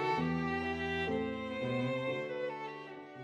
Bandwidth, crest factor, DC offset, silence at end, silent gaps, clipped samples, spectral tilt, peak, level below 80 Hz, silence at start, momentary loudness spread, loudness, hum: 10 kHz; 14 dB; under 0.1%; 0 s; none; under 0.1%; -7 dB/octave; -22 dBFS; -60 dBFS; 0 s; 10 LU; -36 LUFS; none